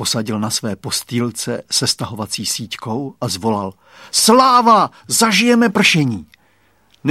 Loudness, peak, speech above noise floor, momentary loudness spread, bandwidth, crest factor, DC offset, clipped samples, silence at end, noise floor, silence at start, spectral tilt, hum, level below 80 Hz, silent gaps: -15 LUFS; 0 dBFS; 41 dB; 13 LU; 16 kHz; 16 dB; under 0.1%; under 0.1%; 0 s; -57 dBFS; 0 s; -3.5 dB/octave; none; -56 dBFS; none